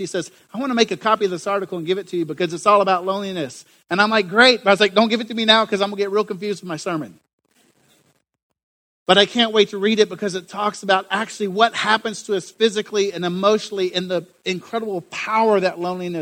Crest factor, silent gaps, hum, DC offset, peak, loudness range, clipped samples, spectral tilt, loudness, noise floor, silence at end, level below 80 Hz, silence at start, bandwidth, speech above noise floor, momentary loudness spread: 20 dB; 7.33-7.38 s, 8.43-8.50 s, 8.63-9.06 s; none; under 0.1%; 0 dBFS; 5 LU; under 0.1%; -4 dB/octave; -19 LUFS; -62 dBFS; 0 s; -66 dBFS; 0 s; 16 kHz; 42 dB; 12 LU